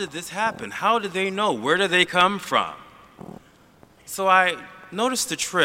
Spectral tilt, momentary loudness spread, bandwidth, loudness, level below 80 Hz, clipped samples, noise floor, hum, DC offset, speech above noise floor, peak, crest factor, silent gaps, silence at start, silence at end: -2.5 dB/octave; 17 LU; 16 kHz; -22 LUFS; -64 dBFS; under 0.1%; -53 dBFS; none; under 0.1%; 31 dB; -2 dBFS; 22 dB; none; 0 s; 0 s